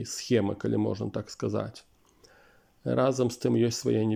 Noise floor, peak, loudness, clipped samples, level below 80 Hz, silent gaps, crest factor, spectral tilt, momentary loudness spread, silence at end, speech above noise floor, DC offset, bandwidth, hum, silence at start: -61 dBFS; -12 dBFS; -29 LUFS; under 0.1%; -64 dBFS; none; 18 dB; -6 dB/octave; 8 LU; 0 s; 33 dB; under 0.1%; 16 kHz; none; 0 s